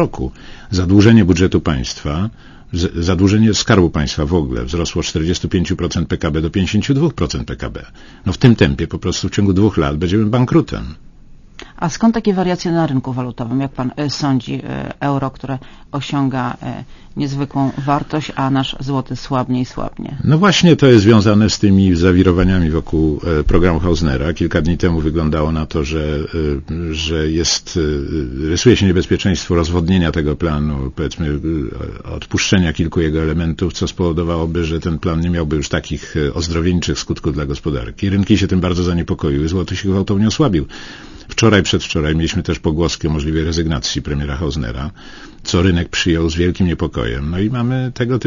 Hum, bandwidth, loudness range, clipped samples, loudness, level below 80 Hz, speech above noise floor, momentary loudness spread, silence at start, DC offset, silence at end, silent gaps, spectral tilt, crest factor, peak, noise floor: none; 7.4 kHz; 6 LU; under 0.1%; -16 LUFS; -28 dBFS; 24 dB; 11 LU; 0 s; under 0.1%; 0 s; none; -6 dB/octave; 16 dB; 0 dBFS; -39 dBFS